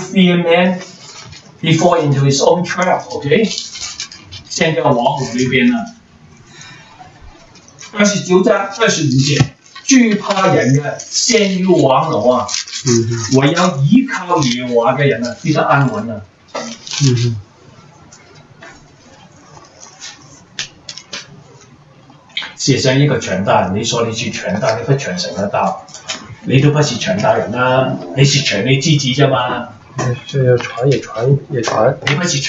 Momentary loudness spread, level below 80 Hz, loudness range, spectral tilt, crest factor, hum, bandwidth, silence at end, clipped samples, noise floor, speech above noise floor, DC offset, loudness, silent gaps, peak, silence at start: 15 LU; -50 dBFS; 9 LU; -5 dB/octave; 14 dB; none; 8.2 kHz; 0 s; under 0.1%; -43 dBFS; 30 dB; under 0.1%; -14 LUFS; none; 0 dBFS; 0 s